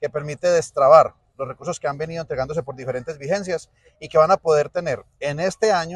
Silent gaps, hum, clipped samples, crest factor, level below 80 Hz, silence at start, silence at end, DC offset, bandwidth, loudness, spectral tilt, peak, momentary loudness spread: none; none; under 0.1%; 20 dB; -54 dBFS; 0 s; 0 s; under 0.1%; 11.5 kHz; -21 LUFS; -5 dB/octave; 0 dBFS; 15 LU